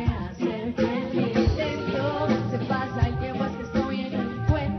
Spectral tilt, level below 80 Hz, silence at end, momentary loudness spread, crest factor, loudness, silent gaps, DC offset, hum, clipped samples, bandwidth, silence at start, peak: -8 dB/octave; -36 dBFS; 0 s; 5 LU; 16 dB; -26 LUFS; none; under 0.1%; none; under 0.1%; 6.4 kHz; 0 s; -10 dBFS